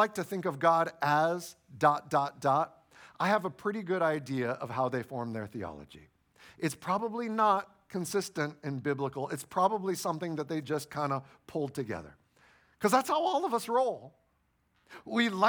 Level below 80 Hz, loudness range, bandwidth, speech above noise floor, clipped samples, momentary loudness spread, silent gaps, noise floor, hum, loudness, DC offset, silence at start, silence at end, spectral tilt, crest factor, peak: -70 dBFS; 5 LU; over 20 kHz; 43 dB; under 0.1%; 11 LU; none; -74 dBFS; none; -31 LUFS; under 0.1%; 0 s; 0 s; -5 dB/octave; 22 dB; -10 dBFS